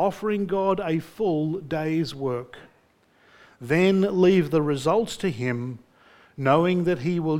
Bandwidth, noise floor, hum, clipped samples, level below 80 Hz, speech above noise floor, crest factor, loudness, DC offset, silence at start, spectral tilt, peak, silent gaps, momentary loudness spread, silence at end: 16 kHz; -61 dBFS; none; under 0.1%; -58 dBFS; 38 dB; 18 dB; -24 LUFS; under 0.1%; 0 s; -7 dB/octave; -6 dBFS; none; 11 LU; 0 s